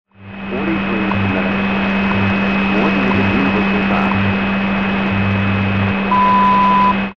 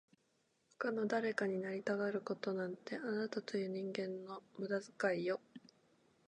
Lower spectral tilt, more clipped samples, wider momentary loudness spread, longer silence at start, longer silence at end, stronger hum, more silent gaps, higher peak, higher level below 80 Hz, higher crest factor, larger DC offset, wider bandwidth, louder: first, -8 dB/octave vs -6 dB/octave; neither; about the same, 6 LU vs 8 LU; second, 0.15 s vs 0.8 s; second, 0.05 s vs 0.7 s; neither; neither; first, -4 dBFS vs -22 dBFS; first, -38 dBFS vs under -90 dBFS; second, 12 dB vs 18 dB; first, 1% vs under 0.1%; second, 6.2 kHz vs 10 kHz; first, -15 LUFS vs -40 LUFS